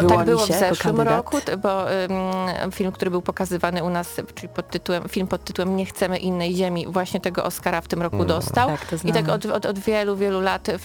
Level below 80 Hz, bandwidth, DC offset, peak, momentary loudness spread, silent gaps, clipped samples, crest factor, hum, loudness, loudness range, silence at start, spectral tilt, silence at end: -48 dBFS; 18 kHz; under 0.1%; 0 dBFS; 6 LU; none; under 0.1%; 22 dB; none; -23 LUFS; 3 LU; 0 s; -5.5 dB/octave; 0 s